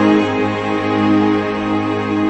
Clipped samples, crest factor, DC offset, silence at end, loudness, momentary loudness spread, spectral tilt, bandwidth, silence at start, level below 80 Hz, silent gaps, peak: under 0.1%; 12 dB; under 0.1%; 0 s; -16 LUFS; 5 LU; -7 dB/octave; 8.4 kHz; 0 s; -46 dBFS; none; -2 dBFS